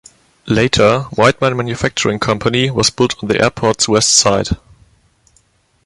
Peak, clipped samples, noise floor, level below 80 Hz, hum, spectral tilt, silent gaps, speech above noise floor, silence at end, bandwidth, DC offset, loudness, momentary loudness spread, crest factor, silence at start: 0 dBFS; under 0.1%; -56 dBFS; -38 dBFS; none; -3.5 dB/octave; none; 42 dB; 1.3 s; 11.5 kHz; under 0.1%; -13 LUFS; 8 LU; 16 dB; 0.45 s